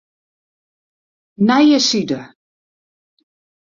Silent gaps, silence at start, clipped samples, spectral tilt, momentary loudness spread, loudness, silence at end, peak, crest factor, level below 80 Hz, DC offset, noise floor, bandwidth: none; 1.4 s; under 0.1%; -4 dB/octave; 13 LU; -15 LUFS; 1.35 s; -2 dBFS; 18 dB; -62 dBFS; under 0.1%; under -90 dBFS; 7.6 kHz